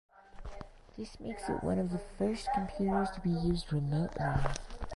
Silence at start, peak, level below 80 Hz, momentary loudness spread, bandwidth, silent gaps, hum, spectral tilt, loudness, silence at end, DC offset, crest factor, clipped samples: 0.35 s; -16 dBFS; -46 dBFS; 17 LU; 11.5 kHz; none; none; -7 dB/octave; -34 LUFS; 0 s; under 0.1%; 18 dB; under 0.1%